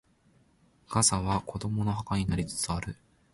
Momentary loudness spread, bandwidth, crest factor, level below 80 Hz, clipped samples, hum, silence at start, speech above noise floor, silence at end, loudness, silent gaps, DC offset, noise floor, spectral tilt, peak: 10 LU; 11.5 kHz; 22 dB; -48 dBFS; under 0.1%; none; 0.9 s; 35 dB; 0.4 s; -29 LUFS; none; under 0.1%; -65 dBFS; -4 dB/octave; -8 dBFS